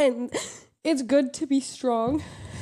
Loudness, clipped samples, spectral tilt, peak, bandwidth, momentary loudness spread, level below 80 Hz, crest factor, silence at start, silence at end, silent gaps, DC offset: -26 LUFS; under 0.1%; -4.5 dB/octave; -10 dBFS; 12.5 kHz; 10 LU; -56 dBFS; 16 dB; 0 s; 0 s; none; under 0.1%